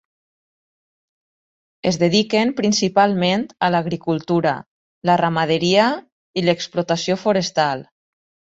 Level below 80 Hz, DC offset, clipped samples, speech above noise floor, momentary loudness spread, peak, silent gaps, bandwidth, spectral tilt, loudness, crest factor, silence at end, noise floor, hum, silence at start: -60 dBFS; under 0.1%; under 0.1%; over 72 dB; 7 LU; -2 dBFS; 4.66-5.02 s, 6.12-6.34 s; 8 kHz; -5 dB/octave; -19 LUFS; 18 dB; 0.65 s; under -90 dBFS; none; 1.85 s